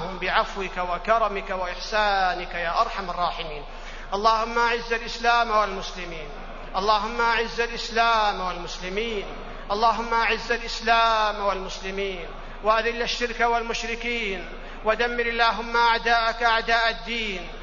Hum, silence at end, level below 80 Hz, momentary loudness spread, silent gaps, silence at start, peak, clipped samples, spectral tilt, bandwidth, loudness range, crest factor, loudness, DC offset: none; 0 s; -38 dBFS; 12 LU; none; 0 s; -6 dBFS; under 0.1%; -3 dB/octave; 7.4 kHz; 3 LU; 18 dB; -24 LUFS; under 0.1%